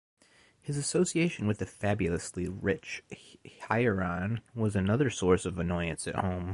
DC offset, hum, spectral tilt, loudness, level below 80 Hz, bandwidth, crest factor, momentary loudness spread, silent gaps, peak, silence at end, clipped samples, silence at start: under 0.1%; none; -5.5 dB/octave; -31 LUFS; -48 dBFS; 11.5 kHz; 20 dB; 11 LU; none; -12 dBFS; 0 s; under 0.1%; 0.65 s